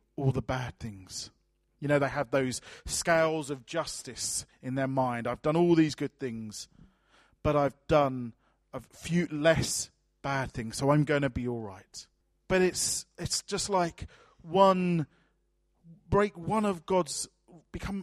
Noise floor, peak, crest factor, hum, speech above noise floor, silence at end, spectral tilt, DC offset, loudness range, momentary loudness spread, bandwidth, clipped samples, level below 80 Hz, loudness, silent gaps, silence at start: -73 dBFS; -8 dBFS; 22 dB; none; 44 dB; 0 s; -4.5 dB/octave; under 0.1%; 3 LU; 16 LU; 14.5 kHz; under 0.1%; -52 dBFS; -29 LUFS; none; 0.2 s